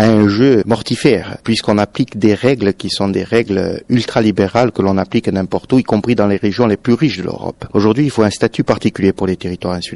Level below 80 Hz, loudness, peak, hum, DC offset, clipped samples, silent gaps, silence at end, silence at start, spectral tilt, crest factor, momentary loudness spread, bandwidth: -44 dBFS; -14 LUFS; 0 dBFS; none; under 0.1%; under 0.1%; none; 0 s; 0 s; -6.5 dB/octave; 14 dB; 6 LU; 11.5 kHz